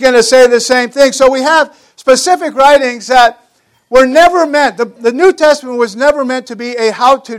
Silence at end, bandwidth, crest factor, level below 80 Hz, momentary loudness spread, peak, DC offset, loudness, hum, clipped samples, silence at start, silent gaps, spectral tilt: 0 s; 15.5 kHz; 10 dB; -44 dBFS; 8 LU; 0 dBFS; under 0.1%; -9 LUFS; none; 2%; 0 s; none; -2 dB/octave